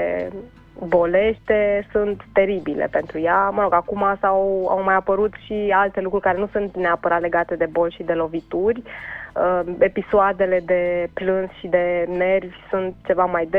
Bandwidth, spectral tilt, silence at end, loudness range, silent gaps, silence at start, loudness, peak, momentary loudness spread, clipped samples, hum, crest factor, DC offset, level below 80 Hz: 4.7 kHz; -8.5 dB/octave; 0 s; 2 LU; none; 0 s; -20 LUFS; -4 dBFS; 7 LU; under 0.1%; none; 16 dB; under 0.1%; -46 dBFS